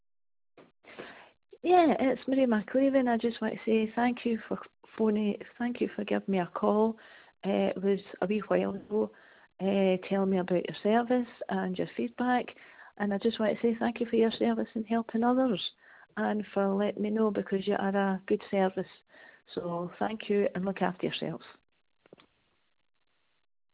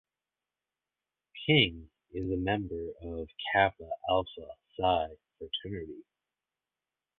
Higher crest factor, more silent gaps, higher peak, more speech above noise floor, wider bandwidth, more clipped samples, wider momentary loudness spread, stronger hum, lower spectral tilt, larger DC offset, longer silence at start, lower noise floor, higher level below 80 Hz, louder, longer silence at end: about the same, 20 dB vs 24 dB; neither; about the same, -12 dBFS vs -10 dBFS; second, 37 dB vs over 59 dB; about the same, 4 kHz vs 4.4 kHz; neither; second, 10 LU vs 21 LU; neither; second, -5 dB/octave vs -8.5 dB/octave; neither; second, 0.6 s vs 1.35 s; second, -66 dBFS vs under -90 dBFS; second, -70 dBFS vs -54 dBFS; about the same, -30 LUFS vs -31 LUFS; first, 2.2 s vs 1.2 s